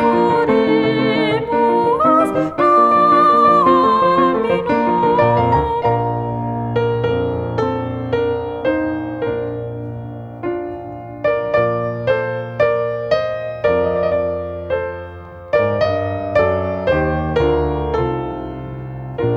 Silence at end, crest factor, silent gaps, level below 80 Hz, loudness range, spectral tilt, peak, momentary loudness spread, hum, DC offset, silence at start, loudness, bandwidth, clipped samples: 0 s; 16 dB; none; -38 dBFS; 9 LU; -8 dB/octave; -2 dBFS; 14 LU; none; under 0.1%; 0 s; -17 LUFS; 11 kHz; under 0.1%